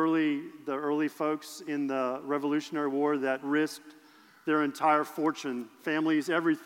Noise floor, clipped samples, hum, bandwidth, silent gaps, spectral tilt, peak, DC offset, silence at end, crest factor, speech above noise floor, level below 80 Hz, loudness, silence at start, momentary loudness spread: -57 dBFS; under 0.1%; none; 16.5 kHz; none; -5 dB/octave; -12 dBFS; under 0.1%; 0 s; 16 dB; 28 dB; under -90 dBFS; -30 LUFS; 0 s; 9 LU